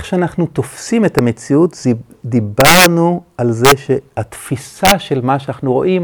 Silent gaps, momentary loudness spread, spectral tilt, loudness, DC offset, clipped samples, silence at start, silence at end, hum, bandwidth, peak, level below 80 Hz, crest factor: none; 13 LU; -4.5 dB/octave; -13 LUFS; under 0.1%; 0.1%; 0 s; 0 s; none; over 20 kHz; 0 dBFS; -40 dBFS; 14 dB